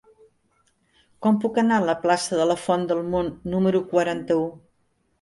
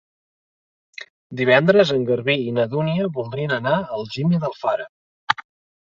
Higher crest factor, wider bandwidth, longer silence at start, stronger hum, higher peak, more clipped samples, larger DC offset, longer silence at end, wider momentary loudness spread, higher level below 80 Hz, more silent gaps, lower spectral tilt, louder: about the same, 16 dB vs 20 dB; first, 11.5 kHz vs 7.4 kHz; first, 1.2 s vs 1 s; neither; second, -6 dBFS vs -2 dBFS; neither; neither; first, 0.65 s vs 0.45 s; second, 6 LU vs 20 LU; about the same, -56 dBFS vs -60 dBFS; second, none vs 1.10-1.30 s, 4.89-5.27 s; second, -5.5 dB/octave vs -7 dB/octave; second, -23 LUFS vs -20 LUFS